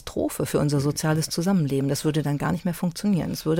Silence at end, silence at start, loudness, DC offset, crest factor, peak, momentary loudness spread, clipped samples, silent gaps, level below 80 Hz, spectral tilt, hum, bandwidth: 0 s; 0 s; -24 LUFS; under 0.1%; 14 dB; -10 dBFS; 4 LU; under 0.1%; none; -50 dBFS; -6 dB/octave; none; 17 kHz